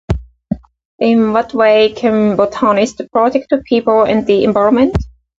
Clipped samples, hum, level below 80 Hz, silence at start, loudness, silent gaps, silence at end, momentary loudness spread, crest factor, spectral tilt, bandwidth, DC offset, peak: under 0.1%; none; -32 dBFS; 0.1 s; -13 LUFS; 0.85-0.98 s; 0.3 s; 11 LU; 12 dB; -6.5 dB/octave; 7.8 kHz; under 0.1%; 0 dBFS